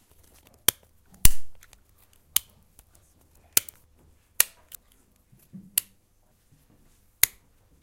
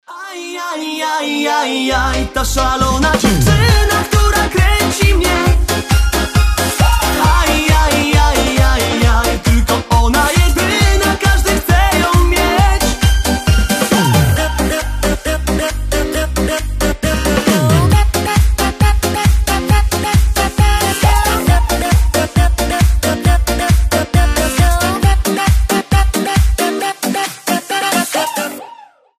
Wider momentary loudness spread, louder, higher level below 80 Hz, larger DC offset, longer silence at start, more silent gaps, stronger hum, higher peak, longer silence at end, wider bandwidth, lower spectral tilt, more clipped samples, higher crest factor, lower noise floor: first, 23 LU vs 6 LU; second, -25 LUFS vs -13 LUFS; second, -38 dBFS vs -16 dBFS; neither; first, 1.25 s vs 0.1 s; neither; neither; about the same, 0 dBFS vs 0 dBFS; about the same, 0.55 s vs 0.45 s; about the same, 17 kHz vs 15.5 kHz; second, -0.5 dB/octave vs -4.5 dB/octave; neither; first, 28 dB vs 12 dB; first, -64 dBFS vs -39 dBFS